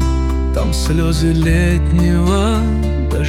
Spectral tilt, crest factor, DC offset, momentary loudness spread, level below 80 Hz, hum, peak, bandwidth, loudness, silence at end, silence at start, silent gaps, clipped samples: -6.5 dB/octave; 10 dB; under 0.1%; 4 LU; -18 dBFS; none; -4 dBFS; 14 kHz; -15 LUFS; 0 s; 0 s; none; under 0.1%